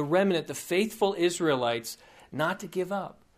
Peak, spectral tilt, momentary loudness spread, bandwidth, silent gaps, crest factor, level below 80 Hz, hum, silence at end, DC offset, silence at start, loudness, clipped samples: -12 dBFS; -4.5 dB/octave; 10 LU; 15.5 kHz; none; 16 dB; -68 dBFS; none; 0.25 s; under 0.1%; 0 s; -28 LUFS; under 0.1%